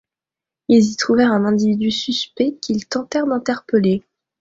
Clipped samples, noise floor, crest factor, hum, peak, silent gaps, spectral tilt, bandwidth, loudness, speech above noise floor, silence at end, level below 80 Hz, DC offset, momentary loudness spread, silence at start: under 0.1%; -88 dBFS; 16 dB; none; -2 dBFS; none; -5 dB/octave; 7.8 kHz; -18 LUFS; 71 dB; 0.4 s; -58 dBFS; under 0.1%; 7 LU; 0.7 s